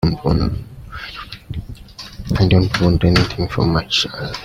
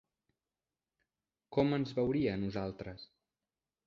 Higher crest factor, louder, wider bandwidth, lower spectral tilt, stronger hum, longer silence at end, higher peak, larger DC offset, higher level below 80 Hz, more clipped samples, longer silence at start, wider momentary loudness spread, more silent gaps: second, 16 dB vs 22 dB; first, -17 LUFS vs -35 LUFS; first, 15 kHz vs 7.2 kHz; second, -6 dB/octave vs -8.5 dB/octave; neither; second, 0 s vs 0.8 s; first, -2 dBFS vs -16 dBFS; neither; first, -32 dBFS vs -62 dBFS; neither; second, 0 s vs 1.5 s; first, 18 LU vs 15 LU; neither